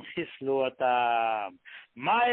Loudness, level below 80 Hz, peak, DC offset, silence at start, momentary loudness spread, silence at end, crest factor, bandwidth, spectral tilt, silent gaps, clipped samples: -28 LUFS; -74 dBFS; -14 dBFS; under 0.1%; 0 s; 15 LU; 0 s; 14 dB; 4.1 kHz; -8 dB/octave; none; under 0.1%